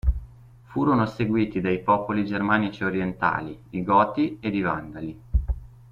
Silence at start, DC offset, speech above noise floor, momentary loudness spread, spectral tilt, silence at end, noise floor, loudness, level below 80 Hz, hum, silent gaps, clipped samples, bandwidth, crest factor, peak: 0.05 s; under 0.1%; 23 dB; 12 LU; -8.5 dB/octave; 0.2 s; -47 dBFS; -25 LUFS; -34 dBFS; none; none; under 0.1%; 7 kHz; 20 dB; -6 dBFS